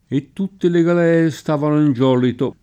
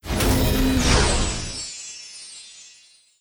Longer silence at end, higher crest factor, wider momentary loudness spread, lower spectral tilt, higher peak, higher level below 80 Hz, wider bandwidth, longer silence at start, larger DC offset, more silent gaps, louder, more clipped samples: second, 0.1 s vs 0.55 s; second, 12 dB vs 18 dB; second, 7 LU vs 20 LU; first, -8 dB/octave vs -4 dB/octave; about the same, -4 dBFS vs -4 dBFS; second, -58 dBFS vs -28 dBFS; second, 15 kHz vs over 20 kHz; about the same, 0.1 s vs 0.05 s; neither; neither; first, -17 LUFS vs -21 LUFS; neither